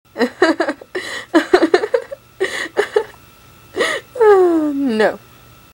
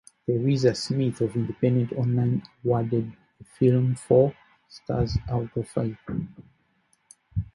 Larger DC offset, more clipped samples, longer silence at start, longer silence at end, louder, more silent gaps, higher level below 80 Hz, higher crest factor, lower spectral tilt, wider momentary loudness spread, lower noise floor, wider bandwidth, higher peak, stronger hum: neither; neither; second, 0.15 s vs 0.3 s; first, 0.55 s vs 0.1 s; first, -16 LUFS vs -25 LUFS; neither; second, -56 dBFS vs -46 dBFS; about the same, 18 dB vs 18 dB; second, -4 dB/octave vs -8 dB/octave; about the same, 13 LU vs 12 LU; second, -44 dBFS vs -68 dBFS; first, 16.5 kHz vs 11.5 kHz; first, 0 dBFS vs -6 dBFS; neither